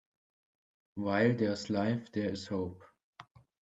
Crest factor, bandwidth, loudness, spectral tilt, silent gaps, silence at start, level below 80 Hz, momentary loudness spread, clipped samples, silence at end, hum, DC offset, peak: 20 dB; 8.2 kHz; -33 LUFS; -6.5 dB/octave; 3.03-3.13 s; 0.95 s; -72 dBFS; 10 LU; under 0.1%; 0.4 s; none; under 0.1%; -14 dBFS